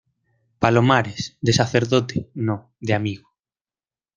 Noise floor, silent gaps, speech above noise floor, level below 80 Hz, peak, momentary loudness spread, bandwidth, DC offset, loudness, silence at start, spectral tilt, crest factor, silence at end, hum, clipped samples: under -90 dBFS; none; over 70 dB; -54 dBFS; -2 dBFS; 11 LU; 9.4 kHz; under 0.1%; -21 LUFS; 0.6 s; -5.5 dB/octave; 22 dB; 1 s; none; under 0.1%